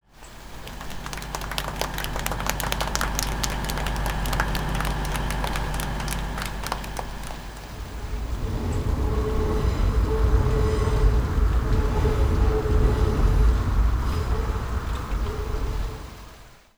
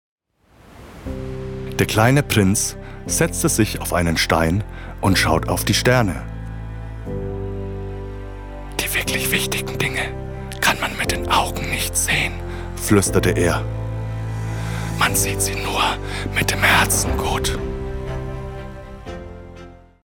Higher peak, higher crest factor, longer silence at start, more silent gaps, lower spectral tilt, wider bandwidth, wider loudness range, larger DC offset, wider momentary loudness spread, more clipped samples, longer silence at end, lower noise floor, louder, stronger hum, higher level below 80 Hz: about the same, -4 dBFS vs -2 dBFS; about the same, 20 dB vs 18 dB; second, 0.2 s vs 0.65 s; neither; about the same, -5 dB/octave vs -4 dB/octave; about the same, over 20 kHz vs 19.5 kHz; about the same, 7 LU vs 5 LU; neither; second, 13 LU vs 17 LU; neither; about the same, 0.2 s vs 0.3 s; second, -46 dBFS vs -53 dBFS; second, -26 LUFS vs -20 LUFS; neither; first, -26 dBFS vs -32 dBFS